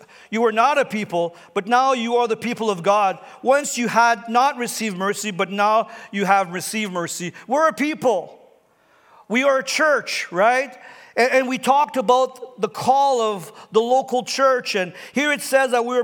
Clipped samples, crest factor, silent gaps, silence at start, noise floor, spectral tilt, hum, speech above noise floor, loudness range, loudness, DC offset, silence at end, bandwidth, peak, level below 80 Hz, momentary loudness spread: under 0.1%; 18 dB; none; 0.3 s; -57 dBFS; -3.5 dB/octave; none; 38 dB; 3 LU; -20 LUFS; under 0.1%; 0 s; 19.5 kHz; -2 dBFS; -78 dBFS; 8 LU